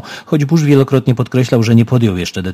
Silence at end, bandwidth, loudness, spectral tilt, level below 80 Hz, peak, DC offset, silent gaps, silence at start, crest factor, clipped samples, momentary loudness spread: 0 s; 15 kHz; -13 LUFS; -7 dB/octave; -40 dBFS; 0 dBFS; under 0.1%; none; 0.05 s; 12 dB; 0.2%; 6 LU